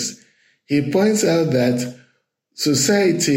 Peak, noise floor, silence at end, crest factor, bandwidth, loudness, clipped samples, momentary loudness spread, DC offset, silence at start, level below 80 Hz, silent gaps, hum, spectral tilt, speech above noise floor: -4 dBFS; -66 dBFS; 0 s; 14 dB; 16.5 kHz; -18 LUFS; under 0.1%; 8 LU; under 0.1%; 0 s; -60 dBFS; none; none; -4.5 dB/octave; 49 dB